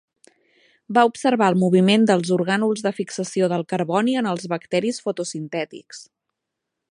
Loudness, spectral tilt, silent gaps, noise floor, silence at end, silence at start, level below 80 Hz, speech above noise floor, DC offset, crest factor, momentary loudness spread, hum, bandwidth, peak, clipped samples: -21 LUFS; -5.5 dB/octave; none; -82 dBFS; 0.9 s; 0.9 s; -70 dBFS; 61 dB; under 0.1%; 18 dB; 12 LU; none; 11 kHz; -2 dBFS; under 0.1%